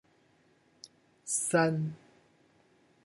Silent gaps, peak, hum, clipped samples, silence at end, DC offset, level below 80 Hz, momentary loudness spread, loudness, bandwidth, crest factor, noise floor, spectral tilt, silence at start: none; -14 dBFS; none; under 0.1%; 1.1 s; under 0.1%; -78 dBFS; 26 LU; -30 LUFS; 11.5 kHz; 22 dB; -67 dBFS; -4.5 dB/octave; 1.25 s